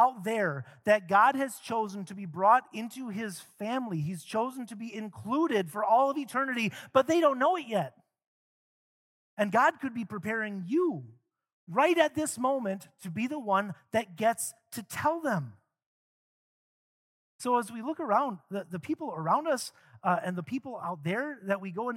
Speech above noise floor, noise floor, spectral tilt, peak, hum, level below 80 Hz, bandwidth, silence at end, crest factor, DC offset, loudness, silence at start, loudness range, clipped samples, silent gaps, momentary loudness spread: over 60 dB; under -90 dBFS; -5 dB/octave; -8 dBFS; none; -78 dBFS; 16.5 kHz; 0 s; 22 dB; under 0.1%; -30 LUFS; 0 s; 6 LU; under 0.1%; 8.27-9.37 s, 11.53-11.67 s, 15.86-17.39 s; 14 LU